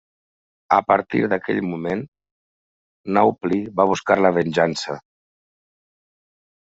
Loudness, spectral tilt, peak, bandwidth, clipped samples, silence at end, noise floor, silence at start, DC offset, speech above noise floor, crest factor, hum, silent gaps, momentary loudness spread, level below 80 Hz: -20 LUFS; -4.5 dB/octave; -2 dBFS; 8 kHz; under 0.1%; 1.7 s; under -90 dBFS; 0.7 s; under 0.1%; over 71 dB; 20 dB; none; 2.08-2.12 s, 2.31-3.04 s; 12 LU; -62 dBFS